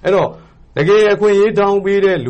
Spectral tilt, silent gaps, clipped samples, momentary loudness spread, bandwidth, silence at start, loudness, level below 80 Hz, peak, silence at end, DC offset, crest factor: -6.5 dB/octave; none; under 0.1%; 8 LU; 8.6 kHz; 0.05 s; -13 LUFS; -46 dBFS; -4 dBFS; 0 s; under 0.1%; 10 dB